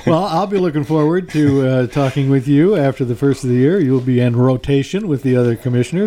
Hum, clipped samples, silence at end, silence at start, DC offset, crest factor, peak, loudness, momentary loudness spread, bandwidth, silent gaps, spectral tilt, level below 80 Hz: none; under 0.1%; 0 s; 0 s; under 0.1%; 12 dB; -2 dBFS; -15 LUFS; 4 LU; 13.5 kHz; none; -8 dB/octave; -44 dBFS